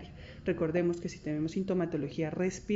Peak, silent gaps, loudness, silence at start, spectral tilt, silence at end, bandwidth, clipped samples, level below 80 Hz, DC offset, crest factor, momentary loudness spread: -18 dBFS; none; -33 LUFS; 0 s; -7 dB/octave; 0 s; 8 kHz; under 0.1%; -56 dBFS; under 0.1%; 16 dB; 7 LU